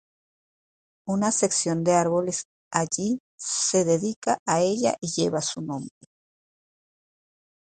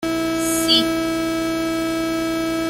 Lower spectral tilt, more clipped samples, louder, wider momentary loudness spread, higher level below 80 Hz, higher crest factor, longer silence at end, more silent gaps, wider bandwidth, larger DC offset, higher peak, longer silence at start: about the same, -4 dB/octave vs -3 dB/octave; neither; second, -25 LUFS vs -20 LUFS; first, 10 LU vs 6 LU; second, -64 dBFS vs -46 dBFS; about the same, 22 dB vs 18 dB; first, 1.9 s vs 0 s; first, 2.45-2.71 s, 3.20-3.38 s, 4.16-4.22 s, 4.39-4.46 s vs none; second, 9.6 kHz vs 16.5 kHz; neither; about the same, -4 dBFS vs -2 dBFS; first, 1.05 s vs 0 s